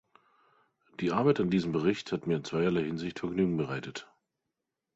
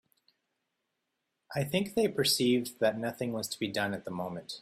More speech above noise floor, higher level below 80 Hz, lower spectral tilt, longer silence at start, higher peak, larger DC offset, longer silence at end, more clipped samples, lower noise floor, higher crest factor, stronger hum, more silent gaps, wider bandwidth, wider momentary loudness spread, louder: first, 56 dB vs 52 dB; first, -62 dBFS vs -70 dBFS; first, -7 dB/octave vs -4 dB/octave; second, 1 s vs 1.5 s; about the same, -12 dBFS vs -14 dBFS; neither; first, 0.9 s vs 0 s; neither; about the same, -86 dBFS vs -83 dBFS; about the same, 20 dB vs 20 dB; neither; neither; second, 8 kHz vs 16 kHz; about the same, 10 LU vs 11 LU; about the same, -30 LUFS vs -31 LUFS